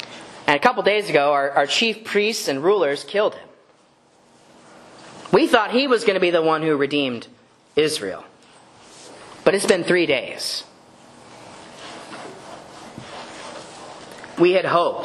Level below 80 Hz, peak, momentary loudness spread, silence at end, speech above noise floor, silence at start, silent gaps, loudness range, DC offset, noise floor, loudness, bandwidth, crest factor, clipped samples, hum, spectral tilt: -64 dBFS; 0 dBFS; 21 LU; 0 s; 37 dB; 0 s; none; 14 LU; under 0.1%; -56 dBFS; -19 LUFS; 12.5 kHz; 22 dB; under 0.1%; none; -4 dB/octave